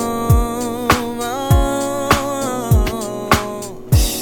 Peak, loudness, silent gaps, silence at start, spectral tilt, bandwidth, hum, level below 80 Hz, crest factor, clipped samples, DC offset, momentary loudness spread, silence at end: 0 dBFS; -18 LUFS; none; 0 s; -5 dB/octave; 17.5 kHz; none; -24 dBFS; 16 dB; under 0.1%; under 0.1%; 6 LU; 0 s